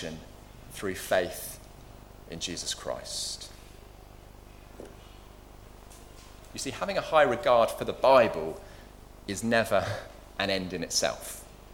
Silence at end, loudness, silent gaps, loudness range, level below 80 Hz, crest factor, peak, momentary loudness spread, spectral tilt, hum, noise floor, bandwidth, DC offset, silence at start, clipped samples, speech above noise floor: 0 s; -28 LUFS; none; 15 LU; -52 dBFS; 22 dB; -8 dBFS; 26 LU; -3 dB/octave; 50 Hz at -50 dBFS; -49 dBFS; 19 kHz; under 0.1%; 0 s; under 0.1%; 21 dB